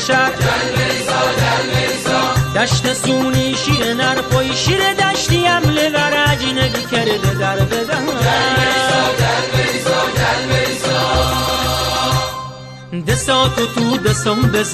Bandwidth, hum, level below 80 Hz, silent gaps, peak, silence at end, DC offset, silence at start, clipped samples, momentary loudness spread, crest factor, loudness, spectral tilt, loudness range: 14 kHz; none; -34 dBFS; none; -2 dBFS; 0 s; under 0.1%; 0 s; under 0.1%; 3 LU; 12 dB; -15 LUFS; -4 dB/octave; 2 LU